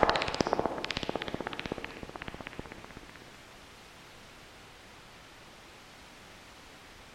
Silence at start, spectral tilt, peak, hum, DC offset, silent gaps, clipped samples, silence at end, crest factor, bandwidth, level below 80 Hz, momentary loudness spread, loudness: 0 s; -4 dB/octave; -6 dBFS; none; under 0.1%; none; under 0.1%; 0 s; 32 dB; 16 kHz; -54 dBFS; 20 LU; -35 LUFS